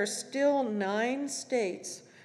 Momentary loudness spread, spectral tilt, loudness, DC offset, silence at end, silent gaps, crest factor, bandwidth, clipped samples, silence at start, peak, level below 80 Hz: 8 LU; -3.5 dB/octave; -31 LUFS; under 0.1%; 0 s; none; 14 dB; 13.5 kHz; under 0.1%; 0 s; -16 dBFS; under -90 dBFS